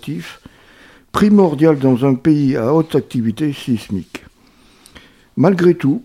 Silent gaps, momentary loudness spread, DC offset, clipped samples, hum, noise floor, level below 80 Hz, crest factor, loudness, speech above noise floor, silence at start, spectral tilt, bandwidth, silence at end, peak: none; 16 LU; under 0.1%; under 0.1%; none; -49 dBFS; -48 dBFS; 16 dB; -15 LUFS; 35 dB; 0.05 s; -8 dB/octave; 15 kHz; 0 s; 0 dBFS